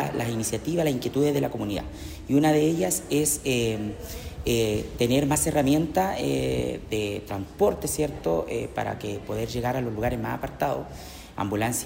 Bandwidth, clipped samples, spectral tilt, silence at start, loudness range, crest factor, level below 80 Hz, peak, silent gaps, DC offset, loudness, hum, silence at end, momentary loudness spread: 16 kHz; under 0.1%; -5 dB/octave; 0 s; 4 LU; 16 dB; -44 dBFS; -10 dBFS; none; under 0.1%; -26 LUFS; none; 0 s; 11 LU